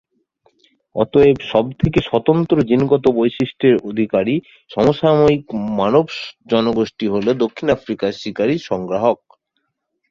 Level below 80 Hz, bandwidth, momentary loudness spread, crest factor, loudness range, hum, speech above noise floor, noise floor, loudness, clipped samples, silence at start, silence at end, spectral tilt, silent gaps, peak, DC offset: -46 dBFS; 7.4 kHz; 9 LU; 16 dB; 3 LU; none; 56 dB; -72 dBFS; -17 LUFS; under 0.1%; 0.95 s; 0.95 s; -7.5 dB/octave; none; -2 dBFS; under 0.1%